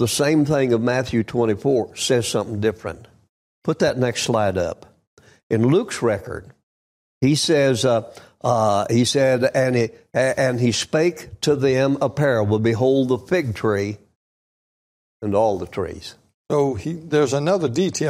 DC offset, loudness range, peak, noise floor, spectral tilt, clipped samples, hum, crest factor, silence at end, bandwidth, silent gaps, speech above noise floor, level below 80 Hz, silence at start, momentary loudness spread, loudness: under 0.1%; 5 LU; -6 dBFS; under -90 dBFS; -5 dB/octave; under 0.1%; none; 14 dB; 0 s; 15.5 kHz; 3.29-3.62 s, 5.07-5.17 s, 5.43-5.50 s, 6.63-7.21 s, 14.16-15.20 s, 16.34-16.45 s; over 71 dB; -54 dBFS; 0 s; 11 LU; -20 LUFS